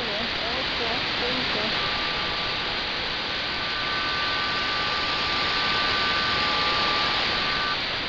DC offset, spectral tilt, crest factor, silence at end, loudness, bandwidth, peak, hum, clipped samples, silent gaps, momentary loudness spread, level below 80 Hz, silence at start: under 0.1%; -3 dB/octave; 16 dB; 0 s; -23 LUFS; 6 kHz; -10 dBFS; none; under 0.1%; none; 4 LU; -46 dBFS; 0 s